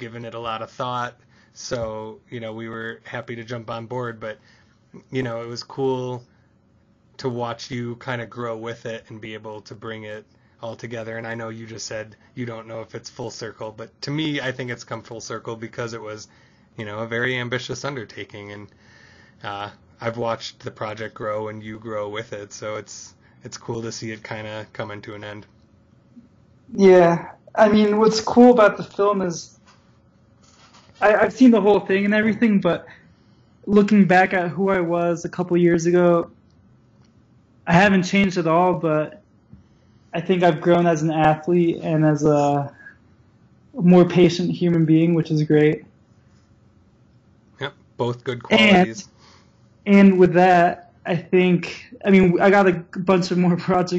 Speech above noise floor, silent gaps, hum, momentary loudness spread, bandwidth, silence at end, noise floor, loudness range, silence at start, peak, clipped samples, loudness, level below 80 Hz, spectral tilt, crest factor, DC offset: 38 dB; none; none; 20 LU; 8 kHz; 0 s; -58 dBFS; 15 LU; 0 s; -2 dBFS; under 0.1%; -19 LUFS; -58 dBFS; -6.5 dB/octave; 18 dB; under 0.1%